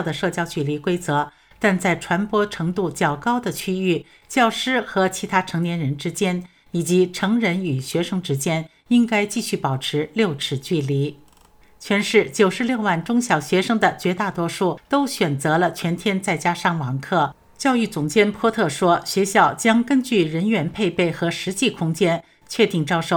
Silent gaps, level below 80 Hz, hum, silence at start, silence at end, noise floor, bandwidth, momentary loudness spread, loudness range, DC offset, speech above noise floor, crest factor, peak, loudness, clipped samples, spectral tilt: none; -56 dBFS; none; 0 s; 0 s; -52 dBFS; 20 kHz; 6 LU; 3 LU; under 0.1%; 32 dB; 20 dB; -2 dBFS; -21 LUFS; under 0.1%; -5 dB/octave